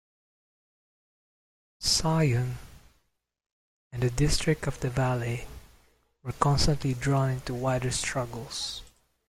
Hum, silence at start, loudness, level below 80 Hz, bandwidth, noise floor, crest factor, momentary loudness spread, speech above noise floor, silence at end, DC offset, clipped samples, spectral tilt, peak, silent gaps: none; 1.8 s; -28 LUFS; -42 dBFS; 15.5 kHz; -74 dBFS; 20 dB; 13 LU; 47 dB; 0.4 s; under 0.1%; under 0.1%; -4.5 dB/octave; -10 dBFS; 3.46-3.91 s